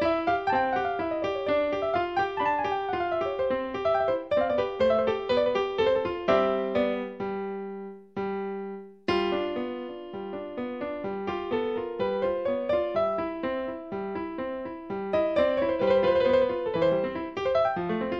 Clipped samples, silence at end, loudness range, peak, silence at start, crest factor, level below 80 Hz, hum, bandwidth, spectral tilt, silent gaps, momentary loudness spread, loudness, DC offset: under 0.1%; 0 s; 6 LU; -10 dBFS; 0 s; 18 dB; -56 dBFS; none; 6.6 kHz; -6.5 dB/octave; none; 11 LU; -28 LUFS; under 0.1%